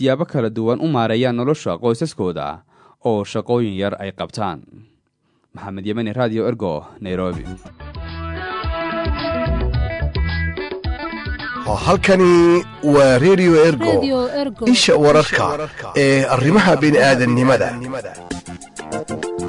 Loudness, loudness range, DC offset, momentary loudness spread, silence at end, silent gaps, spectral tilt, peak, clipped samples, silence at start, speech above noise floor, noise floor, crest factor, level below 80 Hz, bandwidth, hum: -17 LUFS; 10 LU; under 0.1%; 17 LU; 0 s; none; -5.5 dB/octave; -2 dBFS; under 0.1%; 0 s; 48 dB; -64 dBFS; 14 dB; -34 dBFS; 11 kHz; none